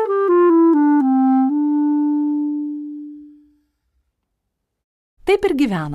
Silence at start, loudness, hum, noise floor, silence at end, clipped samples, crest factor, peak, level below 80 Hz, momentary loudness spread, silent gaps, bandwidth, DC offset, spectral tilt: 0 s; -16 LUFS; none; -76 dBFS; 0 s; under 0.1%; 14 dB; -4 dBFS; -52 dBFS; 15 LU; 4.84-5.17 s; 11 kHz; under 0.1%; -7.5 dB/octave